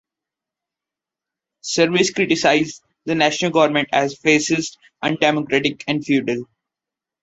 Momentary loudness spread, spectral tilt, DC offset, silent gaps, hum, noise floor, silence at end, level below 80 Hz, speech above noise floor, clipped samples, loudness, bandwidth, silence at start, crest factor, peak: 10 LU; -4 dB/octave; under 0.1%; none; none; -87 dBFS; 0.8 s; -60 dBFS; 69 dB; under 0.1%; -18 LUFS; 8.2 kHz; 1.65 s; 18 dB; -2 dBFS